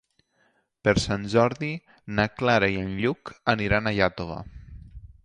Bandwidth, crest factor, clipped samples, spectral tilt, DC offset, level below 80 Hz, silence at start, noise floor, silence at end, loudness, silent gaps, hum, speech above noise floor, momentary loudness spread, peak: 11 kHz; 22 dB; under 0.1%; -5.5 dB/octave; under 0.1%; -44 dBFS; 0.85 s; -68 dBFS; 0.2 s; -25 LUFS; none; none; 43 dB; 15 LU; -4 dBFS